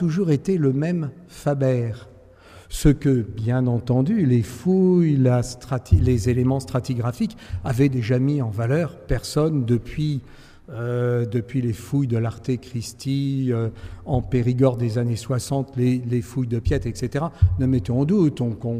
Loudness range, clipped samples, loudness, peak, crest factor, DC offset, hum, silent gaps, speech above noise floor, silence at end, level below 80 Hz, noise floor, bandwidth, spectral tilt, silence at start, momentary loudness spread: 5 LU; under 0.1%; -22 LUFS; -4 dBFS; 18 dB; under 0.1%; none; none; 26 dB; 0 s; -36 dBFS; -47 dBFS; 15 kHz; -7.5 dB/octave; 0 s; 8 LU